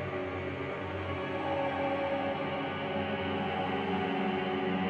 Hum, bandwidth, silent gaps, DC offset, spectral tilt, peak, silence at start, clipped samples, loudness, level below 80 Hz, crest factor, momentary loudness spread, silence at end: none; 8.4 kHz; none; under 0.1%; -7.5 dB/octave; -20 dBFS; 0 s; under 0.1%; -33 LUFS; -64 dBFS; 12 dB; 5 LU; 0 s